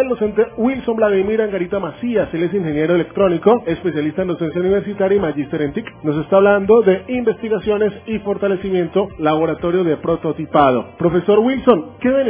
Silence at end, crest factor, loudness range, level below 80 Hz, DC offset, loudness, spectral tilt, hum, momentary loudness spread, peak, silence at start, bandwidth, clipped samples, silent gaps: 0 s; 16 dB; 2 LU; -44 dBFS; under 0.1%; -17 LUFS; -11 dB/octave; none; 7 LU; 0 dBFS; 0 s; 3.6 kHz; under 0.1%; none